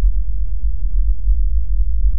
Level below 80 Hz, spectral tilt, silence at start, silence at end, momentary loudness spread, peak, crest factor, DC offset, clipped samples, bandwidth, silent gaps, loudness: -16 dBFS; -14.5 dB/octave; 0 s; 0 s; 4 LU; -4 dBFS; 10 dB; 20%; under 0.1%; 0.5 kHz; none; -22 LUFS